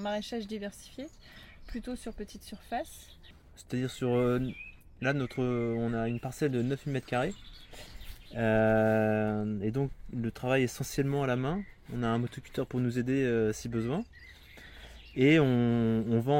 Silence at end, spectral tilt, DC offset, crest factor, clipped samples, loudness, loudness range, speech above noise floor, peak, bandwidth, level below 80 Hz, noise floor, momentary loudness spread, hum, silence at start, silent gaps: 0 s; -6.5 dB/octave; under 0.1%; 20 dB; under 0.1%; -31 LUFS; 6 LU; 21 dB; -12 dBFS; 16.5 kHz; -52 dBFS; -51 dBFS; 22 LU; none; 0 s; none